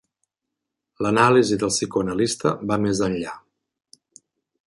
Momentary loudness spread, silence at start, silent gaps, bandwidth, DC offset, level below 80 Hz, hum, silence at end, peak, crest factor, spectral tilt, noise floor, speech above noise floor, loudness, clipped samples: 12 LU; 1 s; none; 11.5 kHz; under 0.1%; -54 dBFS; none; 1.3 s; -2 dBFS; 20 dB; -4.5 dB/octave; -83 dBFS; 63 dB; -21 LUFS; under 0.1%